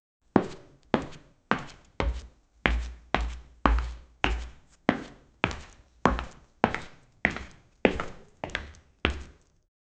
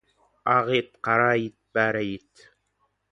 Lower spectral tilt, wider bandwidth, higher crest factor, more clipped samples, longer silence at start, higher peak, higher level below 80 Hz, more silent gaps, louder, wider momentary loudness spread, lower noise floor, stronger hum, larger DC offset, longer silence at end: about the same, -6 dB/octave vs -6.5 dB/octave; second, 8.6 kHz vs 9.8 kHz; first, 32 dB vs 20 dB; neither; about the same, 0.35 s vs 0.45 s; first, 0 dBFS vs -6 dBFS; first, -38 dBFS vs -64 dBFS; neither; second, -30 LUFS vs -24 LUFS; first, 17 LU vs 11 LU; second, -48 dBFS vs -72 dBFS; neither; neither; second, 0.7 s vs 0.95 s